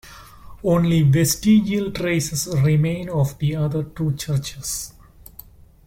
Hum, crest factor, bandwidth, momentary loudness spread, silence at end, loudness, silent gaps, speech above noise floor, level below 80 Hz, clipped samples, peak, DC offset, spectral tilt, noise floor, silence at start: none; 14 dB; 16.5 kHz; 10 LU; 0.95 s; -20 LUFS; none; 26 dB; -44 dBFS; under 0.1%; -6 dBFS; under 0.1%; -5.5 dB/octave; -45 dBFS; 0.05 s